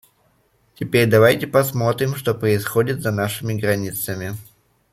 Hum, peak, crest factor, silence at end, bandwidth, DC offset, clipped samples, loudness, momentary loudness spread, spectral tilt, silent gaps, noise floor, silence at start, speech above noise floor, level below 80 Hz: none; -2 dBFS; 18 dB; 0.5 s; 16 kHz; under 0.1%; under 0.1%; -19 LUFS; 12 LU; -5.5 dB/octave; none; -61 dBFS; 0.8 s; 42 dB; -54 dBFS